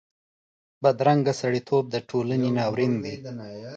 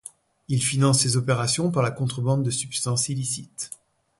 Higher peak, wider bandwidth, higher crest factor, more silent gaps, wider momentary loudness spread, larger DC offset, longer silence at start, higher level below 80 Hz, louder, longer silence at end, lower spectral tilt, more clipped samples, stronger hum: about the same, -6 dBFS vs -6 dBFS; second, 8.6 kHz vs 11.5 kHz; about the same, 18 dB vs 18 dB; neither; about the same, 14 LU vs 15 LU; neither; first, 0.8 s vs 0.05 s; second, -66 dBFS vs -58 dBFS; about the same, -24 LUFS vs -23 LUFS; second, 0 s vs 0.45 s; first, -7 dB/octave vs -4.5 dB/octave; neither; neither